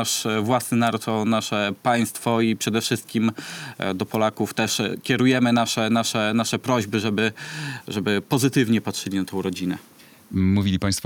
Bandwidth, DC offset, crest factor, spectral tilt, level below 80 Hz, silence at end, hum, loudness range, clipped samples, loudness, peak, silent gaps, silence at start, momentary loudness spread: 19.5 kHz; under 0.1%; 16 dB; -4.5 dB/octave; -60 dBFS; 0 s; none; 2 LU; under 0.1%; -22 LUFS; -6 dBFS; none; 0 s; 8 LU